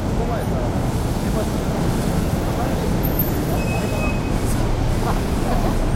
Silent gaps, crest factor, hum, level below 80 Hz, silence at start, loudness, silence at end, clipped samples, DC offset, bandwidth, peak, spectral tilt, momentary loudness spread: none; 14 dB; none; -24 dBFS; 0 s; -22 LUFS; 0 s; under 0.1%; under 0.1%; 16 kHz; -6 dBFS; -6.5 dB/octave; 2 LU